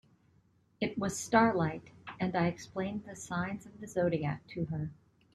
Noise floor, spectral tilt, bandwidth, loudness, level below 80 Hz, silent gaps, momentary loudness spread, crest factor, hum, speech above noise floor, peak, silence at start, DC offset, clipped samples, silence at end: -69 dBFS; -6 dB/octave; 13 kHz; -34 LUFS; -64 dBFS; none; 14 LU; 24 dB; none; 36 dB; -10 dBFS; 0.8 s; under 0.1%; under 0.1%; 0.4 s